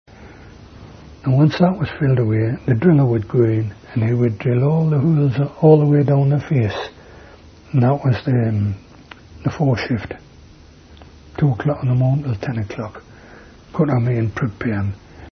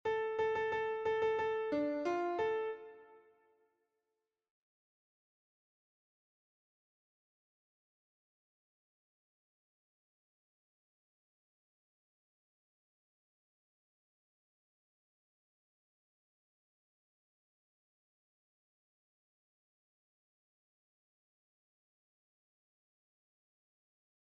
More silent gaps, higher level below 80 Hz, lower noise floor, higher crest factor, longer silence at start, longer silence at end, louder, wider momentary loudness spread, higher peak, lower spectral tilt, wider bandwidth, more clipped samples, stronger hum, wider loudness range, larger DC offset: neither; first, -46 dBFS vs -82 dBFS; second, -44 dBFS vs -90 dBFS; about the same, 18 dB vs 20 dB; first, 0.2 s vs 0.05 s; second, 0 s vs 21.2 s; first, -18 LUFS vs -36 LUFS; first, 13 LU vs 6 LU; first, 0 dBFS vs -26 dBFS; first, -9.5 dB/octave vs -3 dB/octave; about the same, 6.4 kHz vs 7 kHz; neither; neither; second, 6 LU vs 10 LU; neither